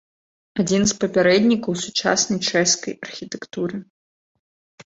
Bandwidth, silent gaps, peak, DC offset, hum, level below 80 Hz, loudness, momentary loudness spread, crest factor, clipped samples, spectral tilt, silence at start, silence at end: 8 kHz; 3.90-4.78 s; -4 dBFS; under 0.1%; none; -56 dBFS; -19 LUFS; 15 LU; 18 dB; under 0.1%; -3.5 dB/octave; 0.55 s; 0.05 s